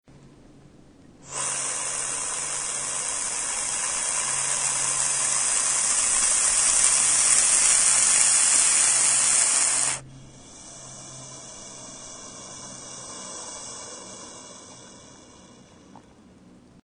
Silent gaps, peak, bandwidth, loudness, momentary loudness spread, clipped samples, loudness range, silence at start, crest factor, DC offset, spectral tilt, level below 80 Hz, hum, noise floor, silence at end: none; -2 dBFS; 11.5 kHz; -19 LUFS; 23 LU; under 0.1%; 22 LU; 0.25 s; 22 dB; under 0.1%; 1.5 dB/octave; -56 dBFS; none; -52 dBFS; 1.75 s